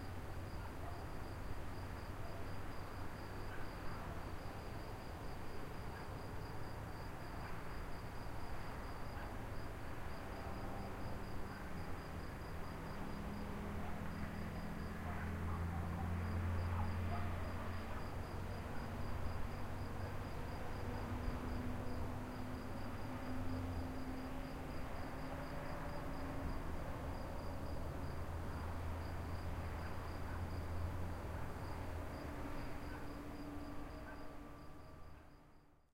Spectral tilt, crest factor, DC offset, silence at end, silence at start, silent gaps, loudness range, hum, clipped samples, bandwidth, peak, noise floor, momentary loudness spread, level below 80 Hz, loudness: -6.5 dB/octave; 16 dB; under 0.1%; 0.2 s; 0 s; none; 6 LU; none; under 0.1%; 16 kHz; -28 dBFS; -65 dBFS; 6 LU; -50 dBFS; -47 LUFS